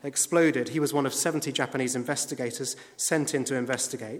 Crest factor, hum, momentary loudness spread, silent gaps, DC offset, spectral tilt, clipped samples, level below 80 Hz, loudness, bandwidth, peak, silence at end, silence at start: 18 dB; none; 8 LU; none; under 0.1%; -3.5 dB/octave; under 0.1%; -76 dBFS; -27 LUFS; 17.5 kHz; -8 dBFS; 0 s; 0.05 s